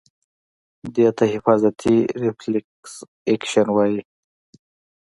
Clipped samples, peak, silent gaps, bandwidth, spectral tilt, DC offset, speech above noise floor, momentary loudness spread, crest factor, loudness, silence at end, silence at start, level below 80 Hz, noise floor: under 0.1%; 0 dBFS; 2.64-2.83 s, 3.08-3.26 s; 11.5 kHz; -6 dB/octave; under 0.1%; over 71 dB; 17 LU; 20 dB; -20 LUFS; 1.05 s; 0.85 s; -58 dBFS; under -90 dBFS